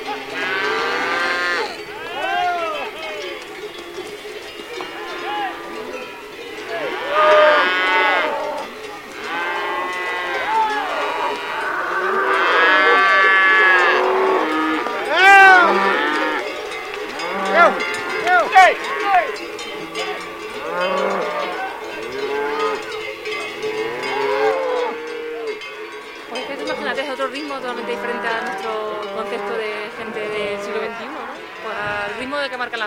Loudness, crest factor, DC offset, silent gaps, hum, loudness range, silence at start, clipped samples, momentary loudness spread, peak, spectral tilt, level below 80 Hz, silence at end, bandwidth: -18 LUFS; 20 dB; under 0.1%; none; none; 12 LU; 0 s; under 0.1%; 17 LU; 0 dBFS; -2.5 dB/octave; -58 dBFS; 0 s; 16.5 kHz